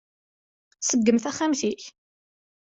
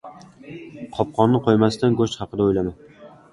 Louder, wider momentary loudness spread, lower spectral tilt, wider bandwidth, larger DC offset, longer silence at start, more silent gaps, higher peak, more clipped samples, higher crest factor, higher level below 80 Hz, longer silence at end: second, -24 LUFS vs -20 LUFS; second, 14 LU vs 20 LU; second, -3.5 dB/octave vs -7 dB/octave; second, 8.2 kHz vs 11.5 kHz; neither; first, 0.8 s vs 0.05 s; neither; second, -8 dBFS vs -2 dBFS; neither; about the same, 20 dB vs 20 dB; second, -68 dBFS vs -48 dBFS; first, 0.85 s vs 0.25 s